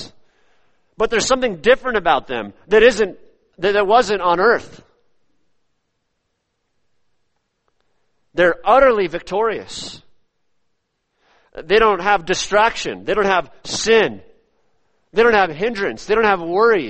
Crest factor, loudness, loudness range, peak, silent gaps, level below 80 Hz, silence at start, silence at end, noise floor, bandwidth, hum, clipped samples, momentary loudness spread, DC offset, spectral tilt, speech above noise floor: 18 dB; -17 LUFS; 5 LU; 0 dBFS; none; -44 dBFS; 0 s; 0 s; -72 dBFS; 8.8 kHz; none; under 0.1%; 12 LU; under 0.1%; -3.5 dB/octave; 56 dB